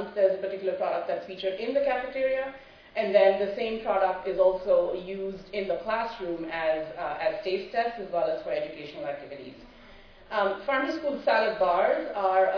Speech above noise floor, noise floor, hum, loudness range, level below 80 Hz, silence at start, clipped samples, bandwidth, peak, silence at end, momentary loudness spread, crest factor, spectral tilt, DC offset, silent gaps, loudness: 23 dB; -50 dBFS; none; 6 LU; -58 dBFS; 0 s; under 0.1%; 5.4 kHz; -8 dBFS; 0 s; 12 LU; 18 dB; -6 dB/octave; under 0.1%; none; -28 LUFS